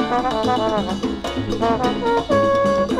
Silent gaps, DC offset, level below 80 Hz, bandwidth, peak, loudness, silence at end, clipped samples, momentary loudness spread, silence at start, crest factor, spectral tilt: none; under 0.1%; -40 dBFS; 13 kHz; -6 dBFS; -20 LUFS; 0 s; under 0.1%; 7 LU; 0 s; 14 dB; -5.5 dB/octave